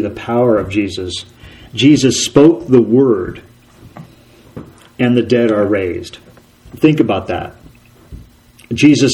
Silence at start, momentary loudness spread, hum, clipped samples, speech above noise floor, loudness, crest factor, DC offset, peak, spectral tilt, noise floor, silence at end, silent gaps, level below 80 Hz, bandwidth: 0 s; 17 LU; none; 0.1%; 31 dB; -13 LUFS; 14 dB; under 0.1%; 0 dBFS; -5.5 dB/octave; -43 dBFS; 0 s; none; -44 dBFS; 13 kHz